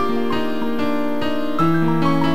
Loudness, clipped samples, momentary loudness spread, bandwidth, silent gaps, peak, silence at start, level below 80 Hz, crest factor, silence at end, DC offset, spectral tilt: -20 LUFS; under 0.1%; 5 LU; 16 kHz; none; -6 dBFS; 0 s; -48 dBFS; 14 dB; 0 s; 8%; -7.5 dB/octave